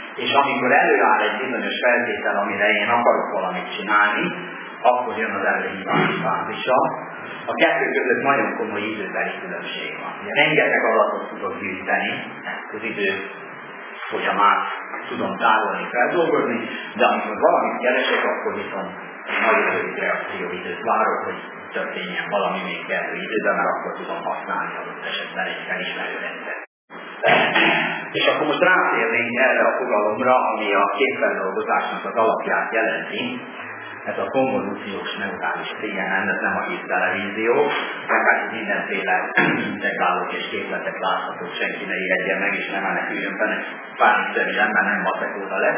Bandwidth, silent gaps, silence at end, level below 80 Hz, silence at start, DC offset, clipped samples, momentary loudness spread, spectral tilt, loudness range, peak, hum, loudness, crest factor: 3.6 kHz; 26.67-26.88 s; 0 s; -70 dBFS; 0 s; under 0.1%; under 0.1%; 11 LU; -8 dB/octave; 6 LU; -2 dBFS; none; -21 LUFS; 20 dB